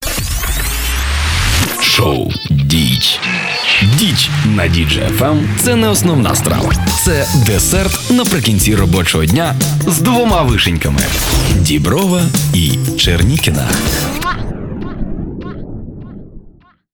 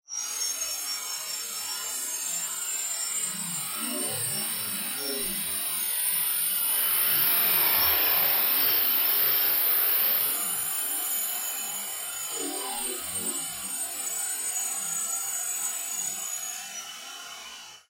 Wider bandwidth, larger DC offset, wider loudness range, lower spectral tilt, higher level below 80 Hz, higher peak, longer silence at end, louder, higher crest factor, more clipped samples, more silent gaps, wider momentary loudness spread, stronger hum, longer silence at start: first, over 20 kHz vs 16 kHz; neither; second, 3 LU vs 9 LU; first, -4 dB/octave vs 0.5 dB/octave; first, -22 dBFS vs -64 dBFS; first, 0 dBFS vs -10 dBFS; first, 0.45 s vs 0.1 s; first, -12 LUFS vs -25 LUFS; second, 12 dB vs 18 dB; neither; neither; about the same, 13 LU vs 11 LU; neither; about the same, 0 s vs 0.1 s